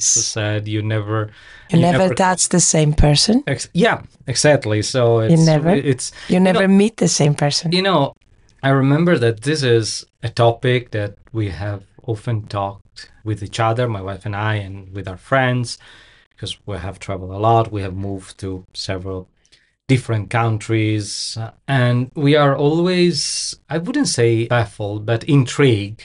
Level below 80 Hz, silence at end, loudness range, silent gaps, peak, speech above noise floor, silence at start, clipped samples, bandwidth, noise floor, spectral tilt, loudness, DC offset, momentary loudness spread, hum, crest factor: -38 dBFS; 0 s; 8 LU; 16.26-16.31 s; -4 dBFS; 39 dB; 0 s; under 0.1%; 11.5 kHz; -56 dBFS; -5 dB/octave; -17 LUFS; under 0.1%; 14 LU; none; 14 dB